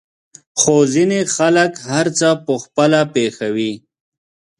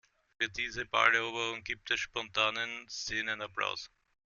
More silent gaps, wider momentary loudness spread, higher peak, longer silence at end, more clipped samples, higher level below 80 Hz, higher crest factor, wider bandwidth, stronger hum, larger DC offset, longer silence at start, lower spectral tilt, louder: neither; second, 8 LU vs 11 LU; first, 0 dBFS vs -10 dBFS; first, 0.8 s vs 0.4 s; neither; about the same, -60 dBFS vs -64 dBFS; second, 16 dB vs 26 dB; first, 11.5 kHz vs 7.4 kHz; neither; neither; first, 0.55 s vs 0.4 s; first, -4 dB/octave vs -1.5 dB/octave; first, -16 LUFS vs -32 LUFS